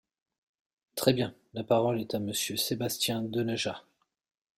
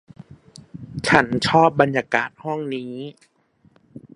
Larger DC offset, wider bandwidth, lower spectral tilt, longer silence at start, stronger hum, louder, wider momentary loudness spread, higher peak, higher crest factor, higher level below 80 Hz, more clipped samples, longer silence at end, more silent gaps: neither; first, 16 kHz vs 11.5 kHz; second, -4 dB/octave vs -5.5 dB/octave; first, 0.95 s vs 0.75 s; neither; second, -30 LUFS vs -19 LUFS; second, 8 LU vs 19 LU; second, -8 dBFS vs 0 dBFS; about the same, 24 dB vs 22 dB; second, -68 dBFS vs -54 dBFS; neither; first, 0.8 s vs 0.15 s; neither